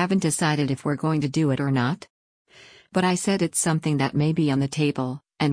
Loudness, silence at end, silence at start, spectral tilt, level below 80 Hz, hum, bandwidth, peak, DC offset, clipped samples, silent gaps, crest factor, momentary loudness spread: -23 LUFS; 0 s; 0 s; -5.5 dB/octave; -58 dBFS; none; 10.5 kHz; -10 dBFS; under 0.1%; under 0.1%; 2.10-2.45 s; 14 dB; 5 LU